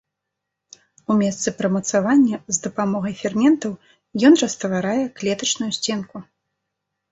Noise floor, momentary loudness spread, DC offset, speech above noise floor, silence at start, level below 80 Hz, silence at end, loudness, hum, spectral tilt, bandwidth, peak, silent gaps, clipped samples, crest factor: -81 dBFS; 14 LU; under 0.1%; 62 dB; 1.1 s; -62 dBFS; 0.9 s; -20 LUFS; none; -4 dB/octave; 8.2 kHz; -2 dBFS; none; under 0.1%; 18 dB